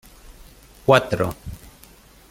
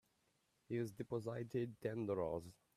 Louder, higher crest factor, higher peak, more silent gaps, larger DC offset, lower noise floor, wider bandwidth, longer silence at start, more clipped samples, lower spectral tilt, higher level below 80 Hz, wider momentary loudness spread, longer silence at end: first, -20 LUFS vs -44 LUFS; first, 22 dB vs 16 dB; first, -2 dBFS vs -28 dBFS; neither; neither; second, -49 dBFS vs -81 dBFS; first, 16.5 kHz vs 14.5 kHz; second, 0.3 s vs 0.7 s; neither; second, -5.5 dB/octave vs -8 dB/octave; first, -46 dBFS vs -74 dBFS; first, 22 LU vs 4 LU; first, 0.75 s vs 0.25 s